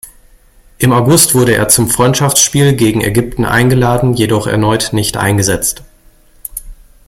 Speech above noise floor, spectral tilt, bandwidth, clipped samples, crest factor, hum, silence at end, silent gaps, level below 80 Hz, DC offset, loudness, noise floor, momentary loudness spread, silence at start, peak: 34 dB; -4 dB/octave; 17 kHz; 0.1%; 12 dB; none; 0.35 s; none; -34 dBFS; under 0.1%; -10 LUFS; -44 dBFS; 11 LU; 0.05 s; 0 dBFS